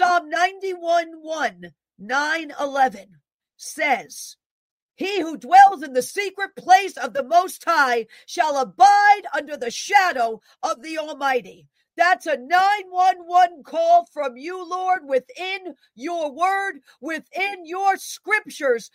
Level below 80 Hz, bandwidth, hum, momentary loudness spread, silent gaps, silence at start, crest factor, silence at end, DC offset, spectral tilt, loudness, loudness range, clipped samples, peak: -76 dBFS; 16 kHz; none; 14 LU; 3.34-3.39 s, 4.46-4.89 s; 0 s; 20 dB; 0.1 s; under 0.1%; -1.5 dB/octave; -20 LUFS; 7 LU; under 0.1%; 0 dBFS